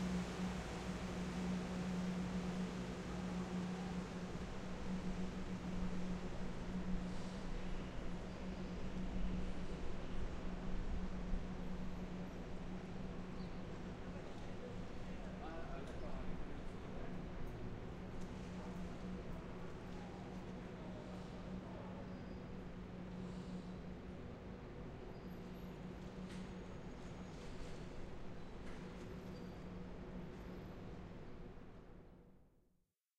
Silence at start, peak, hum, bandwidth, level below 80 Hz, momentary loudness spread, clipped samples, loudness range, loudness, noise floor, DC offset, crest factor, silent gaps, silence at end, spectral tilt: 0 s; -28 dBFS; none; 10.5 kHz; -50 dBFS; 9 LU; under 0.1%; 8 LU; -48 LUFS; -81 dBFS; under 0.1%; 18 dB; none; 0.7 s; -6.5 dB/octave